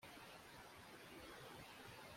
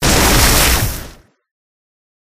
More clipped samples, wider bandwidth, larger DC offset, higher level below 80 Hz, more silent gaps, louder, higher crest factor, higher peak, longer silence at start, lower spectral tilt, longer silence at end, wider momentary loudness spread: neither; about the same, 16.5 kHz vs 16 kHz; neither; second, -76 dBFS vs -22 dBFS; neither; second, -58 LUFS vs -11 LUFS; about the same, 14 dB vs 16 dB; second, -44 dBFS vs 0 dBFS; about the same, 0 s vs 0 s; about the same, -3.5 dB/octave vs -3 dB/octave; second, 0 s vs 1.25 s; second, 2 LU vs 13 LU